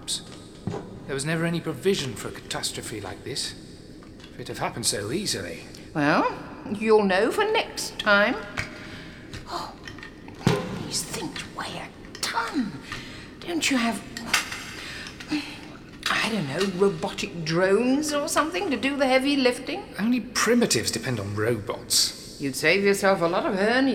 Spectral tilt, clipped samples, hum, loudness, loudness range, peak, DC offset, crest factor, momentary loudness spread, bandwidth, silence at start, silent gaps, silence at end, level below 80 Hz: -3.5 dB/octave; under 0.1%; none; -25 LUFS; 7 LU; -4 dBFS; under 0.1%; 22 dB; 17 LU; 18 kHz; 0 s; none; 0 s; -52 dBFS